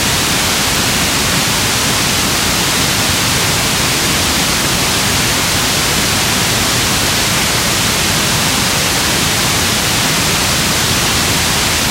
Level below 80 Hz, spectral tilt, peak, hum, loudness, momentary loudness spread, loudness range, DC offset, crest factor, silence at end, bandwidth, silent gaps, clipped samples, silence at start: -30 dBFS; -2 dB/octave; 0 dBFS; none; -11 LUFS; 0 LU; 0 LU; under 0.1%; 12 dB; 0 s; 16 kHz; none; under 0.1%; 0 s